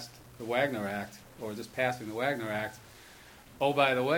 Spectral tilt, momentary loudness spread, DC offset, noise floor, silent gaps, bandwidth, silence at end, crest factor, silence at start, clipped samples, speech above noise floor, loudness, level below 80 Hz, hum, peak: -5 dB/octave; 25 LU; under 0.1%; -53 dBFS; none; over 20 kHz; 0 s; 22 dB; 0 s; under 0.1%; 22 dB; -32 LUFS; -66 dBFS; none; -10 dBFS